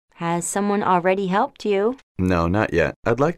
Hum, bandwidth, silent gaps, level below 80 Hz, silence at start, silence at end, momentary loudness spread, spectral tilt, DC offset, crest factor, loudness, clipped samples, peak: none; 14.5 kHz; 2.03-2.15 s, 2.96-3.03 s; -44 dBFS; 0.2 s; 0 s; 5 LU; -5.5 dB/octave; under 0.1%; 16 dB; -21 LUFS; under 0.1%; -6 dBFS